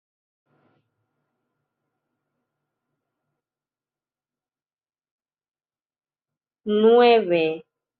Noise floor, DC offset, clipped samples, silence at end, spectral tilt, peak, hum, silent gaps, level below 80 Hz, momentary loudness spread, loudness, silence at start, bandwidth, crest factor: under -90 dBFS; under 0.1%; under 0.1%; 0.4 s; -3 dB/octave; -4 dBFS; none; none; -76 dBFS; 19 LU; -18 LUFS; 6.65 s; 4.7 kHz; 22 dB